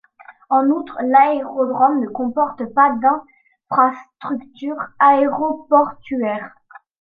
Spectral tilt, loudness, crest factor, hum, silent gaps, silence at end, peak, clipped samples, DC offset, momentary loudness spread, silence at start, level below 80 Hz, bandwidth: -8.5 dB/octave; -17 LUFS; 16 dB; none; none; 0.55 s; -2 dBFS; under 0.1%; under 0.1%; 13 LU; 0.3 s; -64 dBFS; 4.8 kHz